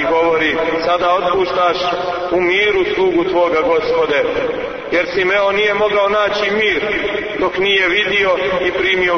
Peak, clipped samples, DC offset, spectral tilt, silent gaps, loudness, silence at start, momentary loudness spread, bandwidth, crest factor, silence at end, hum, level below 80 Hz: -4 dBFS; under 0.1%; under 0.1%; -4.5 dB/octave; none; -15 LUFS; 0 s; 5 LU; 6.6 kHz; 12 dB; 0 s; none; -44 dBFS